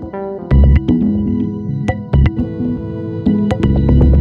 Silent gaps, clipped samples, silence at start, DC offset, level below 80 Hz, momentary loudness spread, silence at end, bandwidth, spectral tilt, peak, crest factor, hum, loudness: none; under 0.1%; 0 s; under 0.1%; -18 dBFS; 10 LU; 0 s; 4.5 kHz; -10 dB/octave; -2 dBFS; 12 dB; none; -15 LUFS